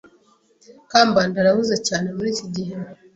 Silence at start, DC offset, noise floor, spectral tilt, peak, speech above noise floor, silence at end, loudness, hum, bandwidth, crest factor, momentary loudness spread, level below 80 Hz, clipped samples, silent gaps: 0.9 s; under 0.1%; -58 dBFS; -4 dB/octave; -2 dBFS; 37 dB; 0.2 s; -20 LUFS; none; 8.4 kHz; 20 dB; 13 LU; -58 dBFS; under 0.1%; none